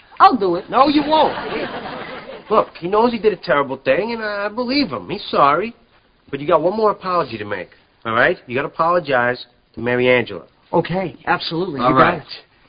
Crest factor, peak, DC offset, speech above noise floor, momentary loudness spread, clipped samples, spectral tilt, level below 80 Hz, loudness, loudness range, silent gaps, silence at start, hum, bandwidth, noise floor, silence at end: 18 dB; 0 dBFS; under 0.1%; 35 dB; 14 LU; under 0.1%; -9 dB/octave; -50 dBFS; -18 LUFS; 2 LU; none; 0.15 s; none; 5.2 kHz; -53 dBFS; 0.3 s